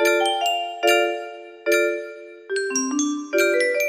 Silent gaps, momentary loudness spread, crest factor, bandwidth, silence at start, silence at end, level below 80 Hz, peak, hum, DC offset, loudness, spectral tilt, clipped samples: none; 12 LU; 16 dB; 15.5 kHz; 0 s; 0 s; -72 dBFS; -6 dBFS; none; under 0.1%; -21 LUFS; 0 dB/octave; under 0.1%